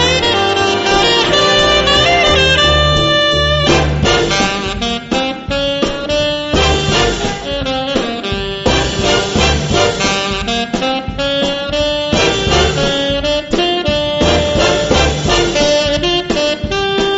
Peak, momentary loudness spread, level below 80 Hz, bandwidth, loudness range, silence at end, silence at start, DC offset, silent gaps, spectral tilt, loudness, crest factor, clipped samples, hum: 0 dBFS; 8 LU; -26 dBFS; 8.2 kHz; 5 LU; 0 s; 0 s; under 0.1%; none; -4 dB/octave; -13 LUFS; 14 dB; under 0.1%; none